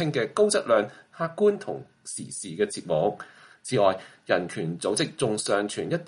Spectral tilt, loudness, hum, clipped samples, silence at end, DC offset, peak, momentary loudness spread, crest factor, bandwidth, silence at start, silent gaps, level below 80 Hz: -4.5 dB/octave; -26 LUFS; none; under 0.1%; 0 s; under 0.1%; -8 dBFS; 13 LU; 18 dB; 11.5 kHz; 0 s; none; -68 dBFS